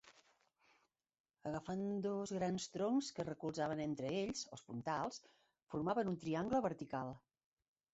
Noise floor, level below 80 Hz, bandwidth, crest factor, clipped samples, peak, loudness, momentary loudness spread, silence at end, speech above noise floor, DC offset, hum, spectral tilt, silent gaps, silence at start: -78 dBFS; -74 dBFS; 8 kHz; 18 dB; under 0.1%; -26 dBFS; -42 LUFS; 9 LU; 0.75 s; 36 dB; under 0.1%; none; -5.5 dB/octave; 1.20-1.24 s, 5.63-5.67 s; 0.05 s